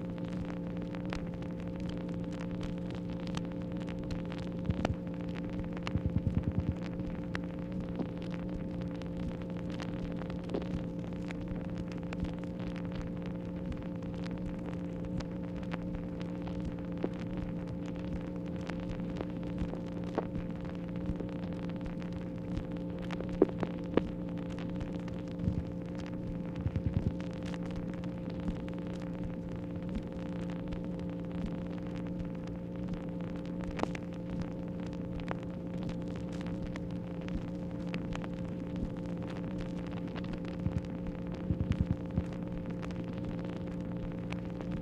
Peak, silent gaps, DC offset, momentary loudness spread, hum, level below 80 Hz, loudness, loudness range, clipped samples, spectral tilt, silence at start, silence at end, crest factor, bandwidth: -10 dBFS; none; under 0.1%; 5 LU; none; -48 dBFS; -38 LUFS; 3 LU; under 0.1%; -8 dB/octave; 0 s; 0 s; 28 dB; 8.4 kHz